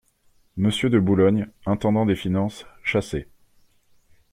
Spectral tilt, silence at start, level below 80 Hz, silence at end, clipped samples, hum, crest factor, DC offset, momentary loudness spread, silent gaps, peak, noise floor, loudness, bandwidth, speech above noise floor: -7 dB/octave; 0.55 s; -50 dBFS; 1.1 s; under 0.1%; none; 18 dB; under 0.1%; 11 LU; none; -6 dBFS; -61 dBFS; -22 LUFS; 13.5 kHz; 39 dB